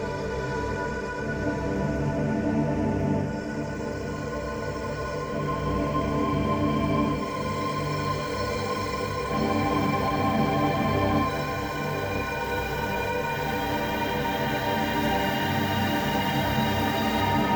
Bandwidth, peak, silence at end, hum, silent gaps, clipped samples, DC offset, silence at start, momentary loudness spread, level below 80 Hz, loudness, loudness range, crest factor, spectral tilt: over 20 kHz; -12 dBFS; 0 s; none; none; under 0.1%; under 0.1%; 0 s; 6 LU; -42 dBFS; -27 LUFS; 3 LU; 14 dB; -6 dB/octave